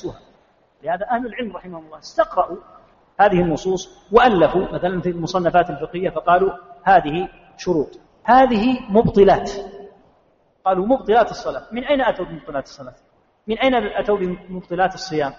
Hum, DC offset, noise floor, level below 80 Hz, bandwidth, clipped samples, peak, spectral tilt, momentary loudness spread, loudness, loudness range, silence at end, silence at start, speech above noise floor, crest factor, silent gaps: none; under 0.1%; -59 dBFS; -44 dBFS; 7.4 kHz; under 0.1%; 0 dBFS; -4.5 dB/octave; 17 LU; -19 LUFS; 5 LU; 0.05 s; 0.05 s; 41 dB; 18 dB; none